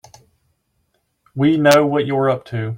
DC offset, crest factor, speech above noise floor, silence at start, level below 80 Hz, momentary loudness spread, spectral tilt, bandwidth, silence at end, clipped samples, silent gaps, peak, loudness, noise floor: under 0.1%; 18 dB; 52 dB; 1.35 s; -58 dBFS; 9 LU; -6 dB/octave; 16.5 kHz; 0 s; under 0.1%; none; -2 dBFS; -16 LUFS; -67 dBFS